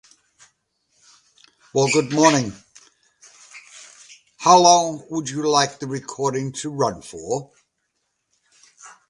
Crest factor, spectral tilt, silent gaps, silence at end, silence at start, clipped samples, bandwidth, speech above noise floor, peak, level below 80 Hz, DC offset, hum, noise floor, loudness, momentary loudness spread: 22 dB; -3.5 dB/octave; none; 0.2 s; 1.75 s; under 0.1%; 11.5 kHz; 55 dB; 0 dBFS; -62 dBFS; under 0.1%; none; -74 dBFS; -19 LUFS; 19 LU